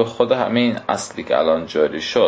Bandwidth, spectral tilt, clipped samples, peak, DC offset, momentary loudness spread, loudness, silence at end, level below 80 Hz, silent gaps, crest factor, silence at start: 8 kHz; -4.5 dB/octave; under 0.1%; -2 dBFS; under 0.1%; 6 LU; -19 LUFS; 0 s; -54 dBFS; none; 16 dB; 0 s